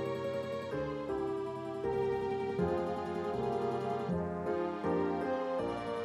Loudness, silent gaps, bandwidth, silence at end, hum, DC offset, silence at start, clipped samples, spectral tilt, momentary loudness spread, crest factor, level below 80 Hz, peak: -35 LUFS; none; 11.5 kHz; 0 s; none; under 0.1%; 0 s; under 0.1%; -7.5 dB/octave; 4 LU; 14 dB; -60 dBFS; -20 dBFS